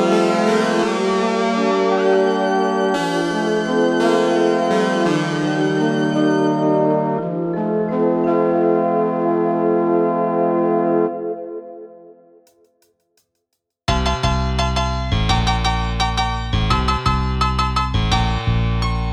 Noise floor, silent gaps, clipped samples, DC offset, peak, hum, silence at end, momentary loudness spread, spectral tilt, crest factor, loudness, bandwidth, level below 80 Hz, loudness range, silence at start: -75 dBFS; none; under 0.1%; under 0.1%; -4 dBFS; none; 0 s; 5 LU; -6 dB/octave; 14 dB; -18 LUFS; 12 kHz; -28 dBFS; 6 LU; 0 s